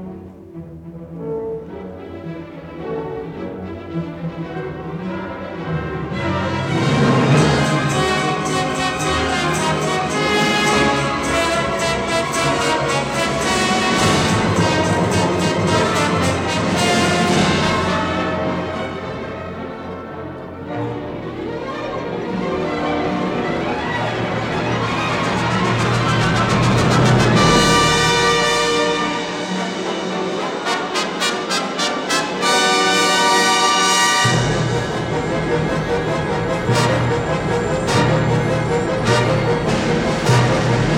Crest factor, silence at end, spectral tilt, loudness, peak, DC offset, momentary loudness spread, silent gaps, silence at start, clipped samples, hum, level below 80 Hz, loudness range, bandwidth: 16 dB; 0 s; -4.5 dB/octave; -17 LUFS; -2 dBFS; under 0.1%; 14 LU; none; 0 s; under 0.1%; none; -40 dBFS; 12 LU; 17 kHz